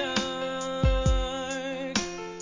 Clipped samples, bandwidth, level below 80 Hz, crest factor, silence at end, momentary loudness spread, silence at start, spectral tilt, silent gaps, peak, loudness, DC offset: under 0.1%; 7.6 kHz; -32 dBFS; 16 dB; 0 s; 7 LU; 0 s; -4.5 dB/octave; none; -12 dBFS; -29 LUFS; 0.1%